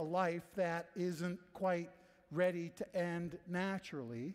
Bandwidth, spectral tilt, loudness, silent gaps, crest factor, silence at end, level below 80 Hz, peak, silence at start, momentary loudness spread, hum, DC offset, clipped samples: 15 kHz; -6.5 dB/octave; -40 LUFS; none; 16 dB; 0 s; -76 dBFS; -22 dBFS; 0 s; 7 LU; none; under 0.1%; under 0.1%